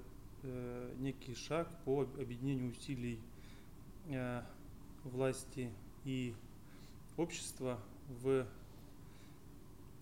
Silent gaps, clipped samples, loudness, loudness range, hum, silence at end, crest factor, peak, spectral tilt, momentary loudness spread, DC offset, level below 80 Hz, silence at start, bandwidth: none; under 0.1%; -43 LUFS; 2 LU; none; 0 s; 18 dB; -24 dBFS; -6 dB/octave; 20 LU; 0.1%; -60 dBFS; 0 s; 16.5 kHz